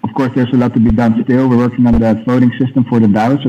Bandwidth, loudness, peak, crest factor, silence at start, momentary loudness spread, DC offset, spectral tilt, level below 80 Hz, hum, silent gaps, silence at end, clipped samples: 7 kHz; -12 LUFS; -2 dBFS; 10 dB; 0.05 s; 2 LU; under 0.1%; -9 dB/octave; -30 dBFS; none; none; 0 s; under 0.1%